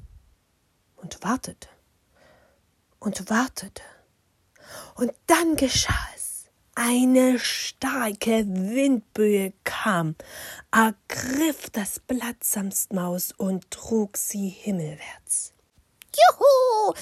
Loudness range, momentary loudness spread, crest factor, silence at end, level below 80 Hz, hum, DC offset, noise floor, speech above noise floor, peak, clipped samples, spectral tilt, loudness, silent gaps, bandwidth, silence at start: 9 LU; 17 LU; 20 dB; 0 s; -48 dBFS; none; under 0.1%; -68 dBFS; 44 dB; -4 dBFS; under 0.1%; -4 dB/octave; -24 LUFS; none; 16 kHz; 0.05 s